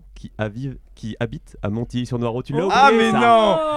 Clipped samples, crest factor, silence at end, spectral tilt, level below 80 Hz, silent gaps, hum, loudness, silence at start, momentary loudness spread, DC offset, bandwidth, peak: under 0.1%; 20 dB; 0 s; -6 dB/octave; -44 dBFS; none; none; -18 LUFS; 0.15 s; 18 LU; under 0.1%; 11.5 kHz; 0 dBFS